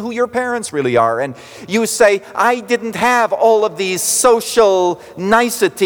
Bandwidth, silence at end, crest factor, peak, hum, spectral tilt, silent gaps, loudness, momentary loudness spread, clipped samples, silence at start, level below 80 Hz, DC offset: over 20 kHz; 0 s; 14 dB; -2 dBFS; none; -3 dB/octave; none; -15 LUFS; 7 LU; under 0.1%; 0 s; -54 dBFS; under 0.1%